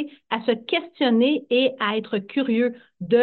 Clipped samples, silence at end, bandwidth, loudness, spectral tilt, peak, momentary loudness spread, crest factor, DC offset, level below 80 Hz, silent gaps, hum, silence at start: under 0.1%; 0 s; 4.5 kHz; -23 LUFS; -8.5 dB/octave; -6 dBFS; 7 LU; 16 dB; under 0.1%; -74 dBFS; none; none; 0 s